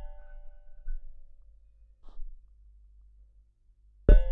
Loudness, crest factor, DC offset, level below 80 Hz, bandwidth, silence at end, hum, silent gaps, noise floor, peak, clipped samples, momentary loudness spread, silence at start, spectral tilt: -30 LUFS; 24 dB; under 0.1%; -30 dBFS; 3.8 kHz; 0 s; 50 Hz at -60 dBFS; none; -62 dBFS; -6 dBFS; under 0.1%; 31 LU; 0 s; -10.5 dB/octave